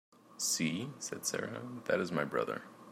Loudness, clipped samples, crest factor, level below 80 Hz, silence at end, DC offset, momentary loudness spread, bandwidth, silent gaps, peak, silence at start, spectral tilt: -36 LUFS; under 0.1%; 20 dB; -78 dBFS; 0 s; under 0.1%; 9 LU; 16 kHz; none; -16 dBFS; 0.25 s; -3 dB/octave